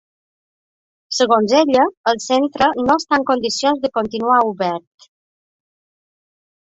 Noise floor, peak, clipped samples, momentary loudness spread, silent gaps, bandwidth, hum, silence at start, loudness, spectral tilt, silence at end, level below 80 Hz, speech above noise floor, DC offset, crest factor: under -90 dBFS; 0 dBFS; under 0.1%; 7 LU; 1.97-2.04 s; 8.2 kHz; none; 1.1 s; -17 LUFS; -3.5 dB/octave; 1.95 s; -56 dBFS; over 74 dB; under 0.1%; 18 dB